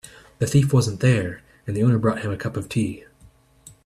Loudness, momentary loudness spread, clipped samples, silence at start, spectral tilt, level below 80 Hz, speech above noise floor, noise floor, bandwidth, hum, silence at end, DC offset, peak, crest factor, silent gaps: -22 LUFS; 12 LU; under 0.1%; 0.05 s; -6.5 dB/octave; -50 dBFS; 33 dB; -53 dBFS; 13 kHz; none; 0.15 s; under 0.1%; -6 dBFS; 18 dB; none